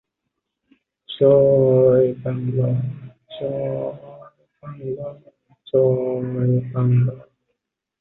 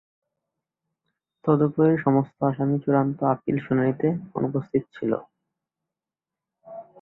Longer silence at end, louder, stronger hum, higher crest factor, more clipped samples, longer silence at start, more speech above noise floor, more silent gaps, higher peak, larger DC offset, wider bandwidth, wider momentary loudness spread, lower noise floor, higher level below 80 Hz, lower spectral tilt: first, 0.8 s vs 0.2 s; first, -19 LUFS vs -24 LUFS; neither; about the same, 18 dB vs 18 dB; neither; second, 1.1 s vs 1.45 s; second, 61 dB vs 67 dB; neither; about the same, -4 dBFS vs -6 dBFS; neither; about the same, 4.1 kHz vs 4.1 kHz; first, 20 LU vs 9 LU; second, -79 dBFS vs -89 dBFS; first, -56 dBFS vs -64 dBFS; about the same, -12.5 dB/octave vs -12 dB/octave